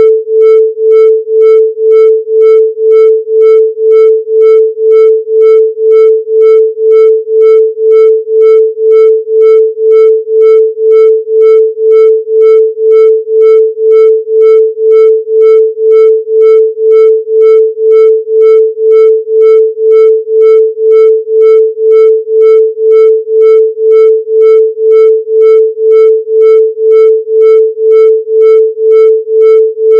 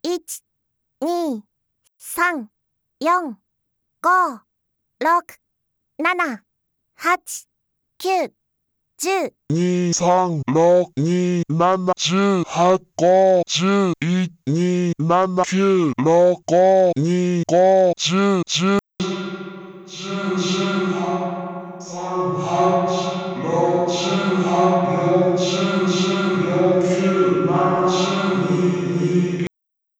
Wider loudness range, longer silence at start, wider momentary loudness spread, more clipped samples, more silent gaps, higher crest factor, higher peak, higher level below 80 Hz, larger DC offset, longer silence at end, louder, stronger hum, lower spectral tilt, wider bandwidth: second, 0 LU vs 8 LU; about the same, 0 s vs 0.05 s; second, 2 LU vs 12 LU; first, 9% vs under 0.1%; neither; second, 4 dB vs 14 dB; first, 0 dBFS vs -4 dBFS; second, under -90 dBFS vs -62 dBFS; neither; second, 0 s vs 0.55 s; first, -5 LUFS vs -19 LUFS; neither; second, -3.5 dB/octave vs -5.5 dB/octave; second, 3.3 kHz vs 17 kHz